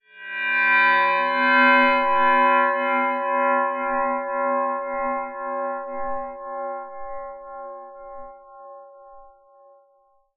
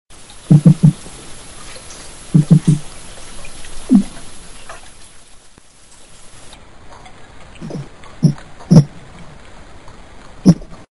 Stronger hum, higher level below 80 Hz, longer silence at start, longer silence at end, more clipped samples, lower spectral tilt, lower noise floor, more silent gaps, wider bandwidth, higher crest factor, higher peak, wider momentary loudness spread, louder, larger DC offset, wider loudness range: neither; second, -56 dBFS vs -40 dBFS; second, 0.15 s vs 0.5 s; first, 1.05 s vs 0.3 s; second, under 0.1% vs 0.3%; second, 1 dB/octave vs -7.5 dB/octave; first, -62 dBFS vs -44 dBFS; neither; second, 4.9 kHz vs 11.5 kHz; about the same, 18 dB vs 18 dB; second, -4 dBFS vs 0 dBFS; second, 21 LU vs 24 LU; second, -20 LUFS vs -13 LUFS; second, under 0.1% vs 0.7%; about the same, 19 LU vs 21 LU